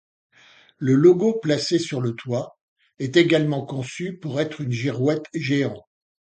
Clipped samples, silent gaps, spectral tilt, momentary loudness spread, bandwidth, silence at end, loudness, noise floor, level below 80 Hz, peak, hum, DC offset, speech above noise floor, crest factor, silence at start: under 0.1%; 2.61-2.76 s; -6 dB/octave; 14 LU; 9.2 kHz; 0.4 s; -22 LUFS; -54 dBFS; -64 dBFS; -2 dBFS; none; under 0.1%; 32 dB; 20 dB; 0.8 s